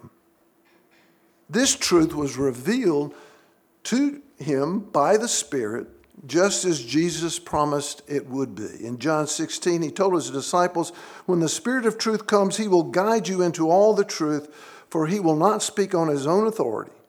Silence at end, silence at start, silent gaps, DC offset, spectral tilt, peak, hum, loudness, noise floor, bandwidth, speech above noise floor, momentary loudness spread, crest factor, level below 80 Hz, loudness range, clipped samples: 0.2 s; 0.05 s; none; under 0.1%; -4 dB/octave; -4 dBFS; none; -23 LUFS; -62 dBFS; 19 kHz; 39 dB; 10 LU; 18 dB; -60 dBFS; 4 LU; under 0.1%